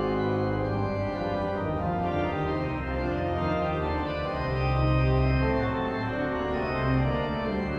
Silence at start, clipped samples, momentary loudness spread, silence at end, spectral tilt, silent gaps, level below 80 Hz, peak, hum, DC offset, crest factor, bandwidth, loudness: 0 s; under 0.1%; 5 LU; 0 s; -8.5 dB/octave; none; -36 dBFS; -12 dBFS; none; under 0.1%; 14 dB; 6.6 kHz; -28 LUFS